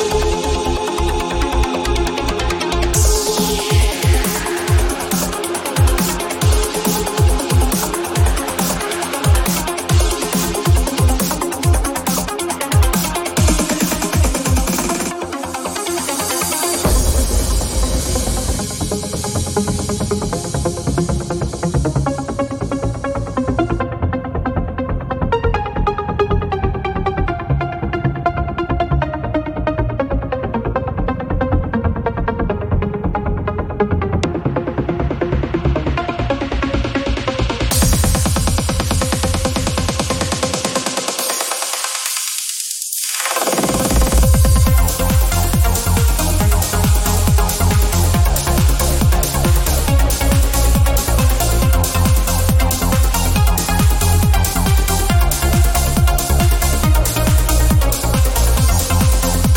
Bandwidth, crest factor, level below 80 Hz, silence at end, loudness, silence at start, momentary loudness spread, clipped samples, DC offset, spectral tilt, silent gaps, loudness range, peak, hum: 18 kHz; 14 dB; -20 dBFS; 0 s; -17 LUFS; 0 s; 6 LU; under 0.1%; under 0.1%; -4.5 dB/octave; none; 5 LU; -2 dBFS; none